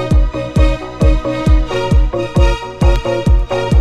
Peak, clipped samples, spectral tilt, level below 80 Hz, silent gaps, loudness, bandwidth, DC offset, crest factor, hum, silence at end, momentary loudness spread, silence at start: 0 dBFS; under 0.1%; -7 dB/octave; -14 dBFS; none; -15 LUFS; 10 kHz; under 0.1%; 12 dB; none; 0 s; 2 LU; 0 s